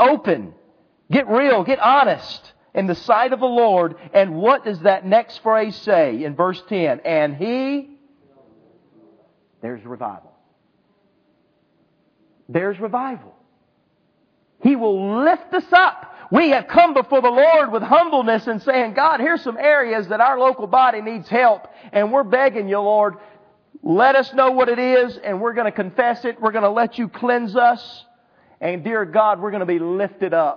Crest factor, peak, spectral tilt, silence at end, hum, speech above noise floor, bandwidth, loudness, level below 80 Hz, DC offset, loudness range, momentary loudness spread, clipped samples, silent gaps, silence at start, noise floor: 18 dB; 0 dBFS; -7.5 dB/octave; 0 s; none; 46 dB; 5.4 kHz; -18 LUFS; -66 dBFS; under 0.1%; 14 LU; 10 LU; under 0.1%; none; 0 s; -63 dBFS